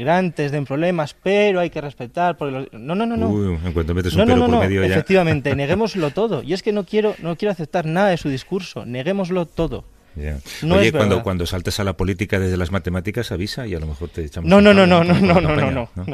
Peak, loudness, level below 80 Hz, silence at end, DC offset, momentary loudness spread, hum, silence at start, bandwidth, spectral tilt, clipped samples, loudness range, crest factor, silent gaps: 0 dBFS; -19 LUFS; -36 dBFS; 0 s; under 0.1%; 12 LU; none; 0 s; 14.5 kHz; -6.5 dB/octave; under 0.1%; 6 LU; 18 dB; none